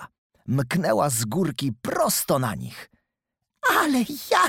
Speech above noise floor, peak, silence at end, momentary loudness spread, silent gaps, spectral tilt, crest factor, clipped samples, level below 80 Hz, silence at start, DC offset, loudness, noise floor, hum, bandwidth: 59 dB; -4 dBFS; 0 s; 12 LU; 0.18-0.30 s; -4 dB/octave; 20 dB; under 0.1%; -58 dBFS; 0 s; under 0.1%; -23 LUFS; -83 dBFS; none; 18 kHz